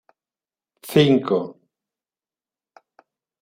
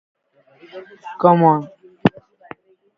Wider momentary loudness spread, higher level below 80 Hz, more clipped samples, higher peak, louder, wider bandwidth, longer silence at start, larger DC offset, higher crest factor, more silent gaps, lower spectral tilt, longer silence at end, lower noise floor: second, 20 LU vs 26 LU; second, -66 dBFS vs -60 dBFS; neither; about the same, -2 dBFS vs 0 dBFS; about the same, -19 LUFS vs -17 LUFS; first, 16 kHz vs 6 kHz; about the same, 0.85 s vs 0.75 s; neither; about the same, 22 dB vs 20 dB; neither; second, -6.5 dB/octave vs -9.5 dB/octave; first, 1.9 s vs 0.9 s; first, under -90 dBFS vs -52 dBFS